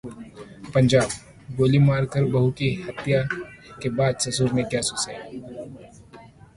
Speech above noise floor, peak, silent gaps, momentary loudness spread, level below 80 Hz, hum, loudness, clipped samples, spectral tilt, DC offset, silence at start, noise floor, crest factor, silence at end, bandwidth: 25 dB; -6 dBFS; none; 20 LU; -50 dBFS; none; -23 LUFS; under 0.1%; -5.5 dB/octave; under 0.1%; 0.05 s; -47 dBFS; 18 dB; 0.3 s; 11.5 kHz